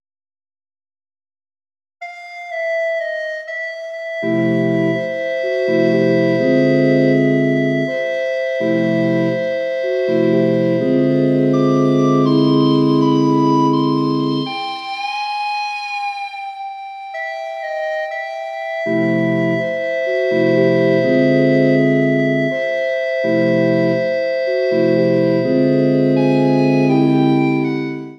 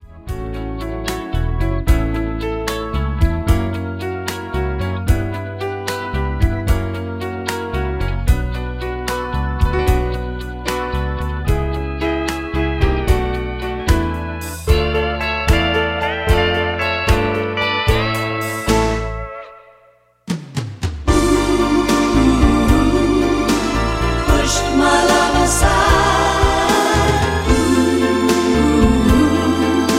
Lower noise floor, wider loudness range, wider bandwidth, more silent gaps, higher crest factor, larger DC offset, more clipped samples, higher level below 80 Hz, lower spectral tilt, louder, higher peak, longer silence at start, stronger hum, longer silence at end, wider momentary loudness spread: first, under -90 dBFS vs -52 dBFS; about the same, 9 LU vs 7 LU; second, 7.6 kHz vs 16.5 kHz; neither; about the same, 14 dB vs 16 dB; neither; neither; second, -70 dBFS vs -22 dBFS; first, -7.5 dB/octave vs -5 dB/octave; about the same, -16 LUFS vs -17 LUFS; about the same, -2 dBFS vs -2 dBFS; first, 2 s vs 0.05 s; neither; about the same, 0.05 s vs 0 s; about the same, 11 LU vs 11 LU